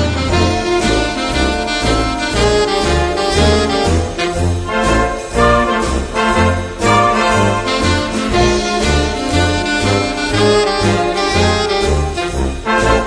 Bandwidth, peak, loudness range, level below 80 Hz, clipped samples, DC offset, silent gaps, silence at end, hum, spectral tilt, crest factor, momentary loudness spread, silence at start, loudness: 10.5 kHz; 0 dBFS; 1 LU; -24 dBFS; under 0.1%; under 0.1%; none; 0 s; none; -4.5 dB/octave; 14 dB; 4 LU; 0 s; -14 LUFS